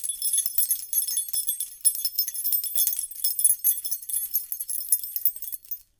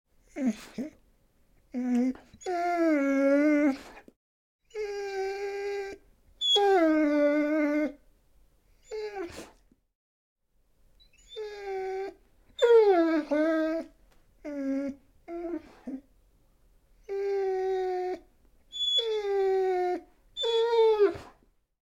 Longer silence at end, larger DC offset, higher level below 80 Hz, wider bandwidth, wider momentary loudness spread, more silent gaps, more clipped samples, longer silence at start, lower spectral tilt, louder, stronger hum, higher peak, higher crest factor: second, 0.15 s vs 0.6 s; neither; second, -70 dBFS vs -62 dBFS; first, 19.5 kHz vs 14 kHz; second, 7 LU vs 19 LU; second, none vs 4.16-4.59 s, 9.95-10.36 s; neither; second, 0 s vs 0.35 s; second, 5 dB/octave vs -3.5 dB/octave; first, -23 LUFS vs -28 LUFS; neither; first, 0 dBFS vs -12 dBFS; first, 26 dB vs 18 dB